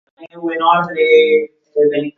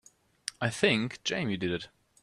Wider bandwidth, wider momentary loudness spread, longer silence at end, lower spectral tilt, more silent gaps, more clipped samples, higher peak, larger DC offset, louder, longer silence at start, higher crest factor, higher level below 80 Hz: second, 6.4 kHz vs 13 kHz; second, 12 LU vs 15 LU; second, 0.05 s vs 0.35 s; first, -6.5 dB/octave vs -4.5 dB/octave; neither; neither; first, 0 dBFS vs -10 dBFS; neither; first, -14 LUFS vs -30 LUFS; second, 0.2 s vs 0.45 s; second, 14 dB vs 22 dB; about the same, -66 dBFS vs -66 dBFS